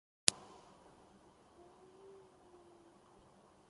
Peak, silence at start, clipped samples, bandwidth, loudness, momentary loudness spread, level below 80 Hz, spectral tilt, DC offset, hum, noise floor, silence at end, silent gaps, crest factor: -4 dBFS; 0.3 s; under 0.1%; 11.5 kHz; -34 LUFS; 30 LU; -78 dBFS; 0 dB/octave; under 0.1%; none; -65 dBFS; 3.4 s; none; 44 dB